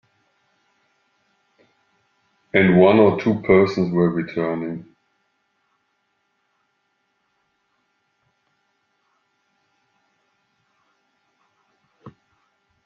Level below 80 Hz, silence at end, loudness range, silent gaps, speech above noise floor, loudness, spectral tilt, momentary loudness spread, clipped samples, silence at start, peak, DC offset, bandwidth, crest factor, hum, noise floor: -62 dBFS; 0.75 s; 14 LU; none; 54 dB; -18 LUFS; -8.5 dB/octave; 13 LU; under 0.1%; 2.55 s; -2 dBFS; under 0.1%; 6.8 kHz; 22 dB; none; -70 dBFS